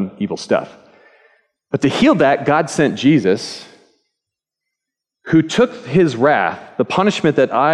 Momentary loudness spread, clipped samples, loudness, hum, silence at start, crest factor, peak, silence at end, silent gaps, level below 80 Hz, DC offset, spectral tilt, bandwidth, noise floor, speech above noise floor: 9 LU; under 0.1%; -16 LUFS; none; 0 s; 14 dB; -2 dBFS; 0 s; none; -56 dBFS; under 0.1%; -6 dB/octave; 11 kHz; -82 dBFS; 67 dB